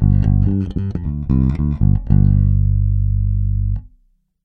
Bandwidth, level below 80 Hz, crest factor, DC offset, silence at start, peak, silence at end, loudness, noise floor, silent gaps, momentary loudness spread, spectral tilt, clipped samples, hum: 2.5 kHz; -20 dBFS; 14 dB; under 0.1%; 0 s; -2 dBFS; 0.55 s; -17 LUFS; -57 dBFS; none; 9 LU; -12 dB/octave; under 0.1%; 50 Hz at -25 dBFS